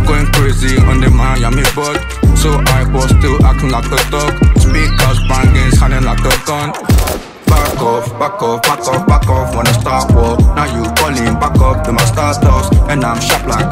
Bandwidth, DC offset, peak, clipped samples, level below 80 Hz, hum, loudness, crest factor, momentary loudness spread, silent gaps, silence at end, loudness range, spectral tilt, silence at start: 16.5 kHz; under 0.1%; 0 dBFS; under 0.1%; -14 dBFS; none; -12 LUFS; 10 dB; 4 LU; none; 0 s; 2 LU; -5 dB/octave; 0 s